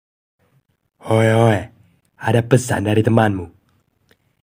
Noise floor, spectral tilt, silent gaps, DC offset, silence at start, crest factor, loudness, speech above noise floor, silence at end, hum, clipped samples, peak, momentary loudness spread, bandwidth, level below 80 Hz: -63 dBFS; -6.5 dB/octave; none; under 0.1%; 1.05 s; 18 dB; -17 LUFS; 47 dB; 0.95 s; none; under 0.1%; 0 dBFS; 18 LU; 16 kHz; -54 dBFS